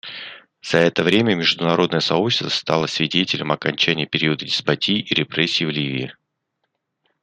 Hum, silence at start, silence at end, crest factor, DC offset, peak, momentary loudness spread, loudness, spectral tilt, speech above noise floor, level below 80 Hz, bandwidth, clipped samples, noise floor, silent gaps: none; 0.05 s; 1.1 s; 20 dB; under 0.1%; 0 dBFS; 8 LU; -19 LUFS; -4.5 dB/octave; 55 dB; -60 dBFS; 11 kHz; under 0.1%; -75 dBFS; none